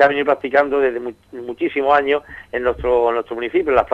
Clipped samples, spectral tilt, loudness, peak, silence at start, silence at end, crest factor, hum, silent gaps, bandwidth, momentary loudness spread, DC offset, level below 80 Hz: under 0.1%; -6.5 dB/octave; -18 LUFS; -2 dBFS; 0 s; 0 s; 16 dB; none; none; 7.8 kHz; 12 LU; under 0.1%; -44 dBFS